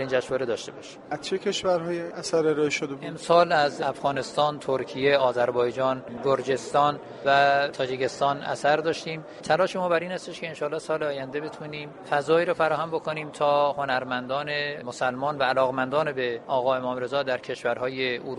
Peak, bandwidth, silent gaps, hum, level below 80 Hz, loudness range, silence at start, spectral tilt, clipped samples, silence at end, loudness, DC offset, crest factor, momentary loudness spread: -6 dBFS; 11.5 kHz; none; none; -66 dBFS; 3 LU; 0 s; -4.5 dB/octave; under 0.1%; 0 s; -26 LUFS; under 0.1%; 20 dB; 10 LU